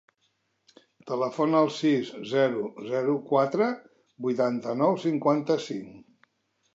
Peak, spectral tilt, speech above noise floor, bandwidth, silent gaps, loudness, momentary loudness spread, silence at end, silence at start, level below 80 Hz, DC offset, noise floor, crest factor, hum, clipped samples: -8 dBFS; -6.5 dB/octave; 48 dB; 8 kHz; none; -26 LUFS; 11 LU; 0.75 s; 1.05 s; -78 dBFS; under 0.1%; -73 dBFS; 18 dB; none; under 0.1%